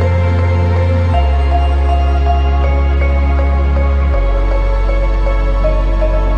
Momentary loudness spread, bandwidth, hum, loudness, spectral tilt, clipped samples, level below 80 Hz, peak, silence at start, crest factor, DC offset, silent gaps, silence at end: 3 LU; 6 kHz; none; -14 LUFS; -8.5 dB/octave; under 0.1%; -12 dBFS; -2 dBFS; 0 s; 8 dB; under 0.1%; none; 0 s